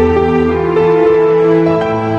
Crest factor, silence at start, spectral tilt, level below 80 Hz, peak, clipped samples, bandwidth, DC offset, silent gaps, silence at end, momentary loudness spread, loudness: 10 dB; 0 s; -8.5 dB/octave; -36 dBFS; 0 dBFS; under 0.1%; 6.8 kHz; under 0.1%; none; 0 s; 3 LU; -11 LUFS